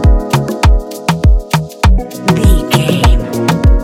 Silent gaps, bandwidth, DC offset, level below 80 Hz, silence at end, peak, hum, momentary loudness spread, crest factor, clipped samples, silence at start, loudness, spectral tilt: none; 16.5 kHz; under 0.1%; -12 dBFS; 0 s; 0 dBFS; none; 4 LU; 10 dB; 0.2%; 0 s; -12 LUFS; -6 dB/octave